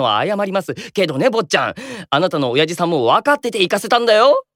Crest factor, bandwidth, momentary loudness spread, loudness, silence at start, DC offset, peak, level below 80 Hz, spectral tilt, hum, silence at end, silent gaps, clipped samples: 14 dB; 16.5 kHz; 8 LU; -16 LUFS; 0 s; under 0.1%; -2 dBFS; -64 dBFS; -4.5 dB/octave; none; 0.15 s; none; under 0.1%